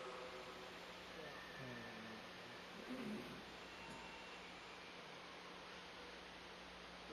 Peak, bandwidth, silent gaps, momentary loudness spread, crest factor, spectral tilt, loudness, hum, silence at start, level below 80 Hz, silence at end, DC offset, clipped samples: -38 dBFS; 13.5 kHz; none; 4 LU; 16 dB; -4 dB/octave; -53 LUFS; none; 0 s; -74 dBFS; 0 s; under 0.1%; under 0.1%